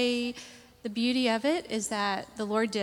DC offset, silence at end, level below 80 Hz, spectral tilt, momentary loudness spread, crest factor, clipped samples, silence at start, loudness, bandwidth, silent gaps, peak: under 0.1%; 0 s; -66 dBFS; -3.5 dB/octave; 13 LU; 16 dB; under 0.1%; 0 s; -29 LUFS; 15.5 kHz; none; -14 dBFS